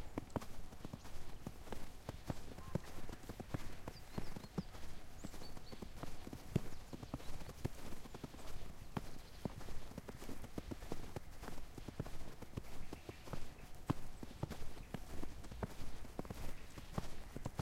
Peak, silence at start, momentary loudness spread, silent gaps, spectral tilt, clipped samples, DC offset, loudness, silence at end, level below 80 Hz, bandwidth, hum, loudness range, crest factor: -20 dBFS; 0 s; 7 LU; none; -6 dB/octave; under 0.1%; under 0.1%; -51 LUFS; 0 s; -52 dBFS; 15.5 kHz; none; 2 LU; 22 dB